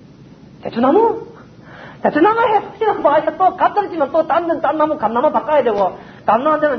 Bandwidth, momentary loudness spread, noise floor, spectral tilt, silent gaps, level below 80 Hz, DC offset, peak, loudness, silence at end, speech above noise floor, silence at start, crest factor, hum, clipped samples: 6.4 kHz; 7 LU; -41 dBFS; -7.5 dB/octave; none; -54 dBFS; under 0.1%; 0 dBFS; -16 LUFS; 0 s; 26 dB; 0.65 s; 16 dB; none; under 0.1%